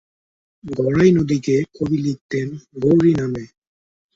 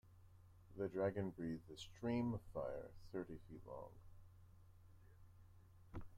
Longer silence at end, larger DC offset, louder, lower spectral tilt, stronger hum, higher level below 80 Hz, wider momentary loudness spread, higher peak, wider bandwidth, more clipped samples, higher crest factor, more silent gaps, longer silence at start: first, 0.7 s vs 0 s; neither; first, -18 LUFS vs -47 LUFS; about the same, -8 dB/octave vs -7.5 dB/octave; neither; first, -50 dBFS vs -66 dBFS; second, 12 LU vs 25 LU; first, -2 dBFS vs -30 dBFS; second, 7.8 kHz vs 15.5 kHz; neither; about the same, 18 dB vs 20 dB; first, 2.21-2.29 s vs none; first, 0.65 s vs 0.05 s